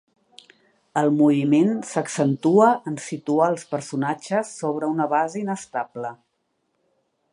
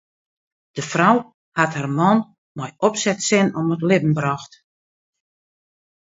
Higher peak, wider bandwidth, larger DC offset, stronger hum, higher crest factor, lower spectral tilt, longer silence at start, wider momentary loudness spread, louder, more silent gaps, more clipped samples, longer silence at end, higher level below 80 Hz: second, -4 dBFS vs 0 dBFS; first, 11.5 kHz vs 8 kHz; neither; neither; about the same, 18 dB vs 20 dB; first, -6.5 dB/octave vs -5 dB/octave; first, 0.95 s vs 0.75 s; about the same, 12 LU vs 14 LU; second, -22 LUFS vs -19 LUFS; second, none vs 1.34-1.52 s, 2.38-2.55 s; neither; second, 1.2 s vs 1.65 s; second, -74 dBFS vs -64 dBFS